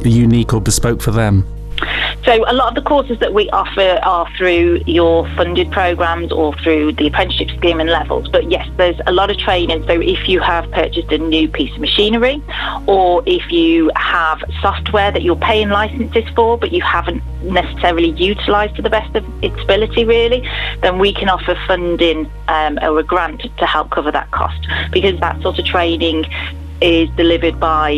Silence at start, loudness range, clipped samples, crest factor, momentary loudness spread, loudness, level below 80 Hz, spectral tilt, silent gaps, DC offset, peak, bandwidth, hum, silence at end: 0 s; 2 LU; under 0.1%; 14 dB; 5 LU; -14 LUFS; -26 dBFS; -5 dB/octave; none; under 0.1%; 0 dBFS; 14 kHz; none; 0 s